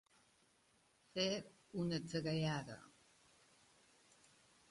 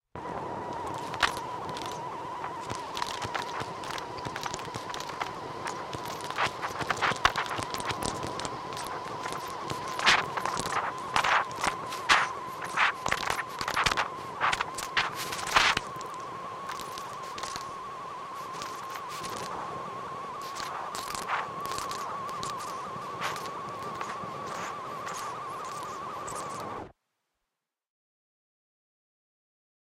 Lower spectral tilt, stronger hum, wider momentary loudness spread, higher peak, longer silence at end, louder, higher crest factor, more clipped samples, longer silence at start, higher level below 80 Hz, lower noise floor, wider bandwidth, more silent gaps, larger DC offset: first, -5 dB/octave vs -2 dB/octave; neither; about the same, 11 LU vs 12 LU; second, -24 dBFS vs -4 dBFS; second, 1.85 s vs 3.1 s; second, -42 LUFS vs -32 LUFS; second, 22 dB vs 28 dB; neither; first, 1.15 s vs 0.15 s; second, -76 dBFS vs -58 dBFS; second, -75 dBFS vs -86 dBFS; second, 11.5 kHz vs 16.5 kHz; neither; neither